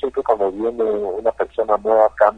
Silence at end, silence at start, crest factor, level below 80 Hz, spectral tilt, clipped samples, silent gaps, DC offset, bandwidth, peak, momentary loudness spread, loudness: 0 s; 0 s; 16 dB; -50 dBFS; -7 dB/octave; under 0.1%; none; under 0.1%; 8.6 kHz; -2 dBFS; 6 LU; -19 LUFS